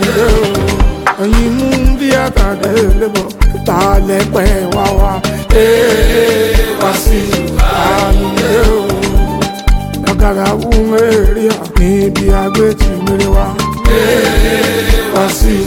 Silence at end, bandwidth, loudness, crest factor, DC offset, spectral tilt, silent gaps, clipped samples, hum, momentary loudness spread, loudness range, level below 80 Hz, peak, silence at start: 0 s; 17 kHz; -11 LUFS; 10 dB; 0.2%; -5.5 dB/octave; none; 0.1%; none; 4 LU; 1 LU; -14 dBFS; 0 dBFS; 0 s